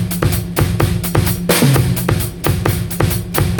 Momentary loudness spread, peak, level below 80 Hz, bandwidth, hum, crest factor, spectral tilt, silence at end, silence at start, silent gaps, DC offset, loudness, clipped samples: 5 LU; 0 dBFS; -28 dBFS; over 20 kHz; none; 16 dB; -5 dB/octave; 0 s; 0 s; none; under 0.1%; -16 LUFS; under 0.1%